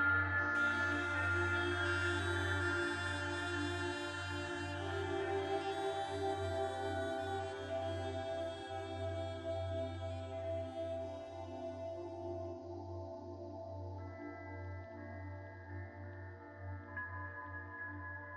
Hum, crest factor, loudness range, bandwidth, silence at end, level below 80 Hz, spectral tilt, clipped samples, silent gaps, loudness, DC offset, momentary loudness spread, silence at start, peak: none; 18 dB; 12 LU; 11.5 kHz; 0 s; -64 dBFS; -5.5 dB/octave; under 0.1%; none; -40 LUFS; under 0.1%; 14 LU; 0 s; -22 dBFS